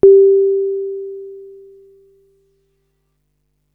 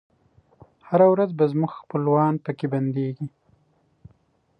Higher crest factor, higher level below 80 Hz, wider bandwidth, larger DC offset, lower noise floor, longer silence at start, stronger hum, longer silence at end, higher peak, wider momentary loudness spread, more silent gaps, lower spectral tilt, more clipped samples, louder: about the same, 16 dB vs 18 dB; first, -52 dBFS vs -68 dBFS; second, 1.4 kHz vs 5.2 kHz; neither; about the same, -67 dBFS vs -64 dBFS; second, 0.05 s vs 0.9 s; first, 50 Hz at -65 dBFS vs none; first, 2.3 s vs 1.3 s; first, 0 dBFS vs -6 dBFS; first, 25 LU vs 11 LU; neither; about the same, -12 dB/octave vs -11 dB/octave; neither; first, -14 LUFS vs -22 LUFS